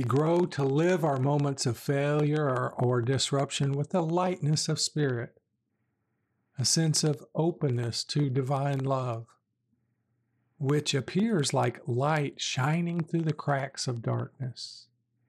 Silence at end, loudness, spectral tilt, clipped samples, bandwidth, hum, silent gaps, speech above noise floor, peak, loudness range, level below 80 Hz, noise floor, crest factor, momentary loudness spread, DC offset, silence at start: 0.45 s; -28 LUFS; -5 dB/octave; under 0.1%; 14 kHz; none; none; 51 dB; -14 dBFS; 4 LU; -74 dBFS; -78 dBFS; 16 dB; 7 LU; under 0.1%; 0 s